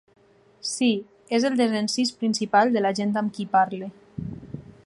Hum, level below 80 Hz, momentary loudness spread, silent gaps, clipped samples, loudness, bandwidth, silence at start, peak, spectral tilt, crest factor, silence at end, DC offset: none; -58 dBFS; 16 LU; none; under 0.1%; -23 LUFS; 11.5 kHz; 0.65 s; -6 dBFS; -4.5 dB/octave; 20 dB; 0.25 s; under 0.1%